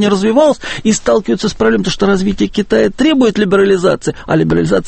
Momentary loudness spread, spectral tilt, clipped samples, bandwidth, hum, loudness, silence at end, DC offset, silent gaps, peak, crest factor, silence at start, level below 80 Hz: 5 LU; -5.5 dB/octave; under 0.1%; 8.8 kHz; none; -12 LUFS; 0 s; under 0.1%; none; 0 dBFS; 12 dB; 0 s; -34 dBFS